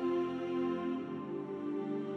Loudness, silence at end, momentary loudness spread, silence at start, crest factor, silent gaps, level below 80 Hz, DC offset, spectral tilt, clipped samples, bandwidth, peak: -37 LUFS; 0 s; 6 LU; 0 s; 12 dB; none; -78 dBFS; under 0.1%; -8 dB/octave; under 0.1%; 6.2 kHz; -24 dBFS